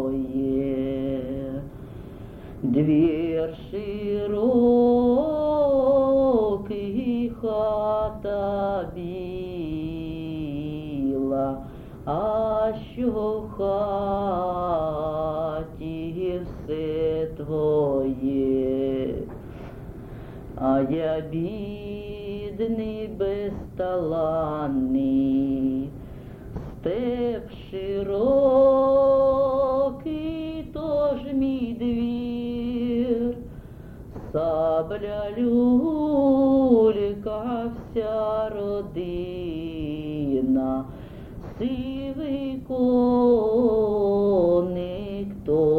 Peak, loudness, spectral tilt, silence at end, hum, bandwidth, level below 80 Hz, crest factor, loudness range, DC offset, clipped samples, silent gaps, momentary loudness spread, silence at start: -6 dBFS; -24 LUFS; -9.5 dB/octave; 0 s; none; 4.7 kHz; -44 dBFS; 16 dB; 7 LU; under 0.1%; under 0.1%; none; 15 LU; 0 s